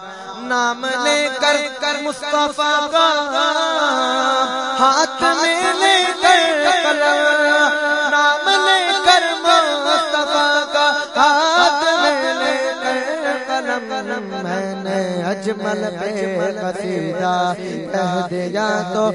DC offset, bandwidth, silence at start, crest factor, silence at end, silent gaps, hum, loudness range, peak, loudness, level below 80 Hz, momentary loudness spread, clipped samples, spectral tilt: under 0.1%; 11 kHz; 0 s; 16 dB; 0 s; none; none; 8 LU; 0 dBFS; -16 LUFS; -62 dBFS; 9 LU; under 0.1%; -2.5 dB/octave